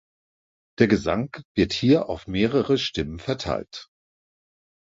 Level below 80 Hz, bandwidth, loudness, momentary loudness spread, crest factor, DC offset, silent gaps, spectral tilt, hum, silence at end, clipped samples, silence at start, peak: -46 dBFS; 7.8 kHz; -23 LUFS; 9 LU; 22 dB; under 0.1%; 1.45-1.55 s; -6 dB/octave; none; 1 s; under 0.1%; 0.8 s; -4 dBFS